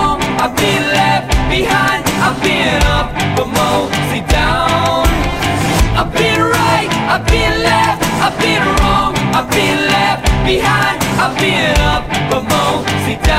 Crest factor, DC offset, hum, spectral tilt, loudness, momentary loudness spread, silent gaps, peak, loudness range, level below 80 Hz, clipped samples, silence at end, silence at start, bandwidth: 10 dB; 0.6%; none; -4.5 dB/octave; -13 LUFS; 3 LU; none; -2 dBFS; 1 LU; -22 dBFS; under 0.1%; 0 s; 0 s; 16 kHz